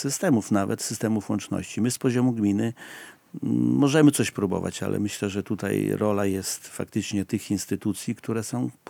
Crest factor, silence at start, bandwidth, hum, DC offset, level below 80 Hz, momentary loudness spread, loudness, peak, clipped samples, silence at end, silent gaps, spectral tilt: 20 dB; 0 s; 19.5 kHz; none; under 0.1%; -70 dBFS; 10 LU; -25 LUFS; -6 dBFS; under 0.1%; 0.2 s; none; -5.5 dB/octave